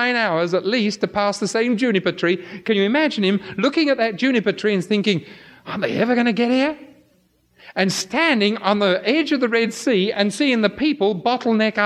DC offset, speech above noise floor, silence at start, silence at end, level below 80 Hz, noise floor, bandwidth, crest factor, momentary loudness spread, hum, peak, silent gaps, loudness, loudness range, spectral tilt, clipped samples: under 0.1%; 41 dB; 0 s; 0 s; -62 dBFS; -60 dBFS; 13.5 kHz; 16 dB; 4 LU; none; -2 dBFS; none; -19 LUFS; 3 LU; -5 dB/octave; under 0.1%